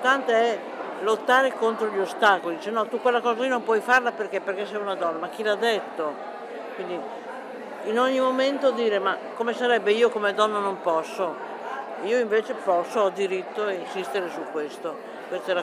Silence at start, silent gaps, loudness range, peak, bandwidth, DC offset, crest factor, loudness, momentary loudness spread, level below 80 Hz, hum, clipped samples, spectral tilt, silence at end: 0 s; none; 5 LU; -6 dBFS; 15 kHz; under 0.1%; 18 dB; -25 LUFS; 13 LU; -80 dBFS; none; under 0.1%; -3.5 dB/octave; 0 s